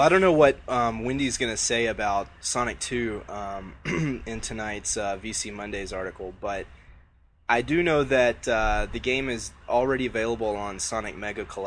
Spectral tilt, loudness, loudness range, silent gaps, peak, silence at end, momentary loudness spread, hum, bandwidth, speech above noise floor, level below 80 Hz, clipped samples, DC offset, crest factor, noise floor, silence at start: -4 dB/octave; -26 LUFS; 6 LU; none; -4 dBFS; 0 s; 12 LU; none; 10.5 kHz; 32 dB; -42 dBFS; under 0.1%; under 0.1%; 22 dB; -57 dBFS; 0 s